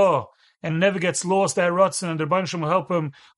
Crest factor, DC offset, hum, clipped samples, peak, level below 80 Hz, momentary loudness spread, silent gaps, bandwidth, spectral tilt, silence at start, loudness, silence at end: 16 dB; under 0.1%; none; under 0.1%; -6 dBFS; -66 dBFS; 7 LU; none; 11.5 kHz; -4.5 dB/octave; 0 s; -22 LUFS; 0.25 s